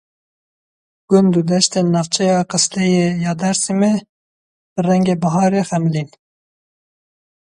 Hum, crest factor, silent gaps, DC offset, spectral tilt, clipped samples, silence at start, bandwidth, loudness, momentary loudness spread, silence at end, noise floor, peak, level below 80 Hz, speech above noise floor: none; 18 dB; 4.09-4.76 s; under 0.1%; -5 dB/octave; under 0.1%; 1.1 s; 11.5 kHz; -16 LUFS; 6 LU; 1.45 s; under -90 dBFS; 0 dBFS; -58 dBFS; over 75 dB